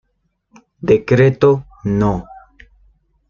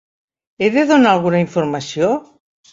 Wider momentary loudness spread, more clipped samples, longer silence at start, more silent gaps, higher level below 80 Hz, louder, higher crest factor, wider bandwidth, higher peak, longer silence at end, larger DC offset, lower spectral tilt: first, 11 LU vs 8 LU; neither; first, 0.85 s vs 0.6 s; neither; first, -42 dBFS vs -58 dBFS; about the same, -15 LUFS vs -16 LUFS; about the same, 16 dB vs 16 dB; second, 7 kHz vs 7.8 kHz; about the same, -2 dBFS vs -2 dBFS; first, 0.95 s vs 0.5 s; neither; first, -8.5 dB/octave vs -6 dB/octave